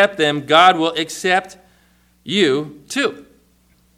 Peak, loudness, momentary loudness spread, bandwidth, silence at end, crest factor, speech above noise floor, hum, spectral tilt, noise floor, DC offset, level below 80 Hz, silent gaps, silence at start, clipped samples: 0 dBFS; -16 LUFS; 11 LU; 15.5 kHz; 0.75 s; 18 dB; 40 dB; none; -3.5 dB/octave; -56 dBFS; under 0.1%; -60 dBFS; none; 0 s; under 0.1%